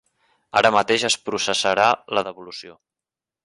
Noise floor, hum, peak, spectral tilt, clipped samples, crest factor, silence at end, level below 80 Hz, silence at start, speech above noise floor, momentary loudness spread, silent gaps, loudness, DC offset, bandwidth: -89 dBFS; none; -4 dBFS; -2 dB/octave; under 0.1%; 20 dB; 0.75 s; -60 dBFS; 0.55 s; 68 dB; 17 LU; none; -19 LUFS; under 0.1%; 11.5 kHz